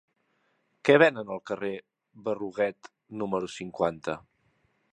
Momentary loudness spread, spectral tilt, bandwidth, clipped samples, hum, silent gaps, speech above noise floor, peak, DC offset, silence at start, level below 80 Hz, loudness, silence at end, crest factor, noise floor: 17 LU; -5.5 dB/octave; 9.6 kHz; under 0.1%; none; none; 45 dB; -4 dBFS; under 0.1%; 0.85 s; -68 dBFS; -28 LUFS; 0.75 s; 26 dB; -73 dBFS